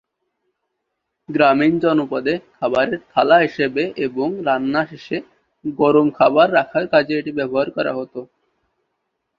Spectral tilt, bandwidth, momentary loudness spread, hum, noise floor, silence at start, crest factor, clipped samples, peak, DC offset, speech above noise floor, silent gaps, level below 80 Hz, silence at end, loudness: -7.5 dB/octave; 7.2 kHz; 13 LU; none; -76 dBFS; 1.3 s; 18 dB; under 0.1%; 0 dBFS; under 0.1%; 59 dB; none; -60 dBFS; 1.15 s; -18 LUFS